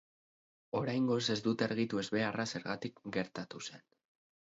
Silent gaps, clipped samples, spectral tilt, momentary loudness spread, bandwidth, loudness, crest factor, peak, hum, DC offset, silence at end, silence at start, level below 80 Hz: none; under 0.1%; -4.5 dB/octave; 11 LU; 7.6 kHz; -36 LUFS; 20 dB; -18 dBFS; none; under 0.1%; 0.7 s; 0.75 s; -74 dBFS